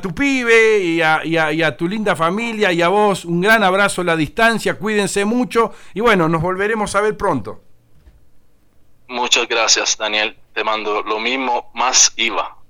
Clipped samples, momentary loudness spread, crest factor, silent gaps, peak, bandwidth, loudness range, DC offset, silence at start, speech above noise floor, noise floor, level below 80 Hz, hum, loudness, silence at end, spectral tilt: under 0.1%; 8 LU; 16 dB; none; 0 dBFS; 19 kHz; 4 LU; under 0.1%; 0 s; 31 dB; -47 dBFS; -46 dBFS; none; -16 LUFS; 0.05 s; -3 dB/octave